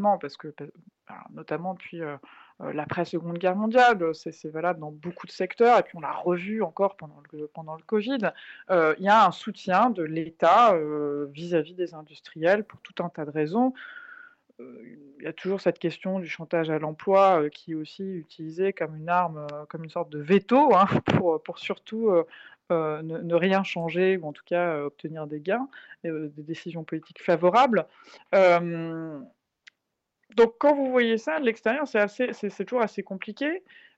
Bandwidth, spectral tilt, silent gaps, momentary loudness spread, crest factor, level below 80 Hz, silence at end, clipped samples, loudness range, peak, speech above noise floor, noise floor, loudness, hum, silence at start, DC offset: 8 kHz; -6.5 dB/octave; none; 18 LU; 16 dB; -68 dBFS; 0.4 s; under 0.1%; 6 LU; -10 dBFS; 56 dB; -82 dBFS; -25 LUFS; none; 0 s; under 0.1%